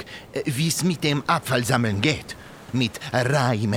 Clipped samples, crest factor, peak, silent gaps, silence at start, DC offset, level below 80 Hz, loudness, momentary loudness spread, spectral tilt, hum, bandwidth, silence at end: under 0.1%; 20 dB; -4 dBFS; none; 0 s; under 0.1%; -54 dBFS; -23 LUFS; 9 LU; -4.5 dB/octave; none; 17 kHz; 0 s